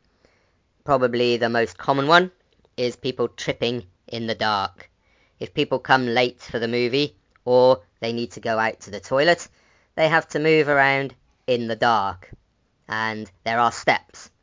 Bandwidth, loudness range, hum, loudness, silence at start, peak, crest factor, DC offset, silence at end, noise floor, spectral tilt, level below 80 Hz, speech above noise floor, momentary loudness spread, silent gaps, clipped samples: 7.6 kHz; 3 LU; none; -22 LUFS; 0.85 s; 0 dBFS; 22 dB; under 0.1%; 0.15 s; -65 dBFS; -5 dB/octave; -58 dBFS; 43 dB; 13 LU; none; under 0.1%